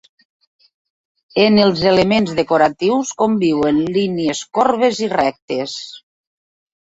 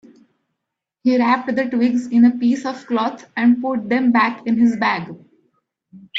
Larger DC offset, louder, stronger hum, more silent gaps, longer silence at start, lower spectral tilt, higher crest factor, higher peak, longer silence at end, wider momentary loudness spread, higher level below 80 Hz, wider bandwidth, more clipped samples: neither; about the same, -16 LUFS vs -18 LUFS; neither; first, 5.42-5.48 s vs none; first, 1.35 s vs 1.05 s; about the same, -5 dB/octave vs -6 dB/octave; about the same, 16 dB vs 16 dB; about the same, -2 dBFS vs -4 dBFS; first, 0.95 s vs 0 s; about the same, 10 LU vs 8 LU; first, -52 dBFS vs -66 dBFS; about the same, 8 kHz vs 7.6 kHz; neither